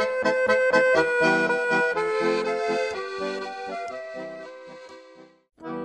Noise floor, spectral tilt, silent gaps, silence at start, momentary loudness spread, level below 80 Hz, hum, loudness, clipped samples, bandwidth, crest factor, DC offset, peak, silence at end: -50 dBFS; -4.5 dB/octave; none; 0 s; 20 LU; -64 dBFS; none; -23 LUFS; under 0.1%; 9.8 kHz; 16 dB; under 0.1%; -8 dBFS; 0 s